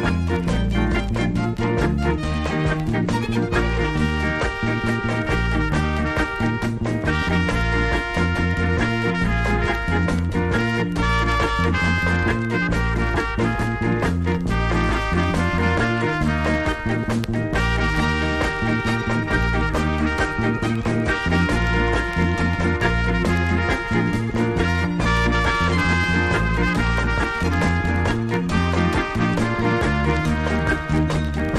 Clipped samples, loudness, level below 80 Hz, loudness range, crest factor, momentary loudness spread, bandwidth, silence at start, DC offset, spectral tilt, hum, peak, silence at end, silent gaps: under 0.1%; -21 LUFS; -28 dBFS; 2 LU; 14 dB; 3 LU; 12.5 kHz; 0 s; under 0.1%; -6.5 dB/octave; none; -6 dBFS; 0 s; none